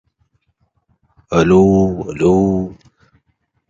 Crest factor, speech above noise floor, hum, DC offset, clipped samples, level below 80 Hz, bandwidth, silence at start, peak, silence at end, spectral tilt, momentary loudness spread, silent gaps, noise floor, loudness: 16 dB; 53 dB; none; under 0.1%; under 0.1%; -38 dBFS; 7.6 kHz; 1.3 s; 0 dBFS; 0.95 s; -8 dB/octave; 9 LU; none; -66 dBFS; -14 LUFS